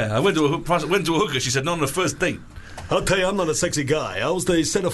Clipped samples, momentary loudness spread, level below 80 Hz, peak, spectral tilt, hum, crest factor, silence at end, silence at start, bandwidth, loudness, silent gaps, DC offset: under 0.1%; 5 LU; -42 dBFS; -8 dBFS; -4 dB/octave; none; 14 dB; 0 s; 0 s; 12.5 kHz; -21 LUFS; none; under 0.1%